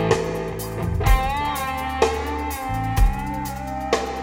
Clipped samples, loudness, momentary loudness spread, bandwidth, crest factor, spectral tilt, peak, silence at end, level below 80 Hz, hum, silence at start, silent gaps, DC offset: under 0.1%; -24 LUFS; 7 LU; 17.5 kHz; 18 dB; -5.5 dB/octave; -4 dBFS; 0 s; -26 dBFS; none; 0 s; none; under 0.1%